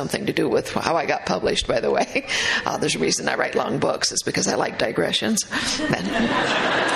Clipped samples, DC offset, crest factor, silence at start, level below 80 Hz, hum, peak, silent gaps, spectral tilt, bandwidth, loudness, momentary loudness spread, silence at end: under 0.1%; under 0.1%; 18 dB; 0 s; -48 dBFS; none; -4 dBFS; none; -3 dB/octave; 13.5 kHz; -21 LUFS; 3 LU; 0 s